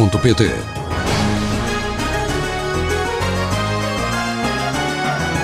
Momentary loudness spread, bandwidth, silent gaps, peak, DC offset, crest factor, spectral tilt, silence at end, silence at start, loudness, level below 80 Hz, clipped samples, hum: 5 LU; 15.5 kHz; none; -2 dBFS; 0.2%; 16 dB; -5 dB/octave; 0 s; 0 s; -19 LUFS; -30 dBFS; under 0.1%; none